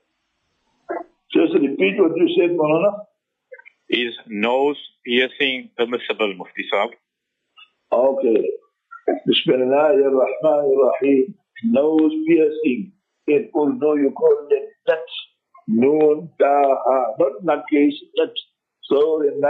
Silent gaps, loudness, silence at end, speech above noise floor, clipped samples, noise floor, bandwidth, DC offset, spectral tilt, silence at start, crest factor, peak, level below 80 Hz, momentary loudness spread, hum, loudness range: none; -19 LUFS; 0 s; 60 dB; under 0.1%; -77 dBFS; 4.3 kHz; under 0.1%; -7.5 dB/octave; 0.9 s; 14 dB; -4 dBFS; -76 dBFS; 11 LU; none; 5 LU